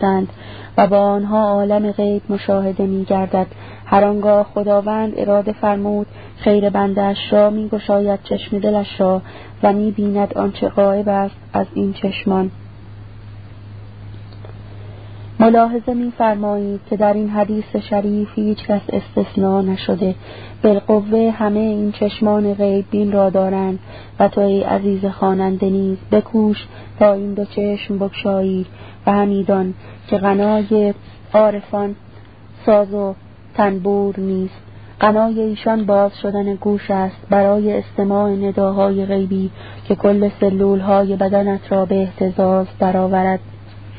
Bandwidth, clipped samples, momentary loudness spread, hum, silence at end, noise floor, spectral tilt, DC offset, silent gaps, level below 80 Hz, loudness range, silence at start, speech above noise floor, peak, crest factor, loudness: 4.9 kHz; under 0.1%; 13 LU; none; 0 s; -40 dBFS; -12 dB/octave; 0.5%; none; -46 dBFS; 3 LU; 0 s; 24 dB; 0 dBFS; 16 dB; -17 LUFS